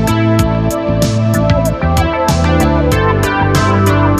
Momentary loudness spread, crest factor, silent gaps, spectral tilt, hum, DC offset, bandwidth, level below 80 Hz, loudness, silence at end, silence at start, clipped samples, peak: 3 LU; 10 dB; none; -6 dB/octave; none; under 0.1%; 15 kHz; -22 dBFS; -12 LUFS; 0 s; 0 s; under 0.1%; 0 dBFS